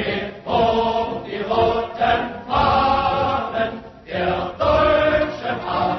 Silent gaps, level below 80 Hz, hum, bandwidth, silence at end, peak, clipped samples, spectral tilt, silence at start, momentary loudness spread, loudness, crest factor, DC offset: none; -38 dBFS; none; 6.2 kHz; 0 s; -6 dBFS; under 0.1%; -6.5 dB/octave; 0 s; 9 LU; -20 LUFS; 14 dB; under 0.1%